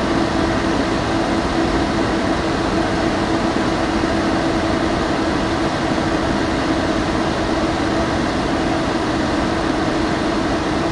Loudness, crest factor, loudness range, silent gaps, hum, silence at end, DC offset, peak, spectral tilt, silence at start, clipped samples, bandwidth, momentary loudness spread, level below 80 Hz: -19 LUFS; 16 dB; 0 LU; none; none; 0 s; under 0.1%; -2 dBFS; -5.5 dB/octave; 0 s; under 0.1%; 11.5 kHz; 1 LU; -32 dBFS